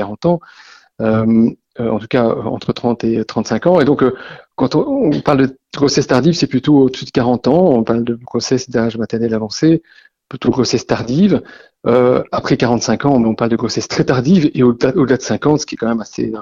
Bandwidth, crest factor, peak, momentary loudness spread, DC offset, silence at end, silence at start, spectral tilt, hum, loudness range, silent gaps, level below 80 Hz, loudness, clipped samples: 7.6 kHz; 14 dB; 0 dBFS; 8 LU; under 0.1%; 0 s; 0 s; -6 dB/octave; none; 3 LU; none; -46 dBFS; -15 LUFS; under 0.1%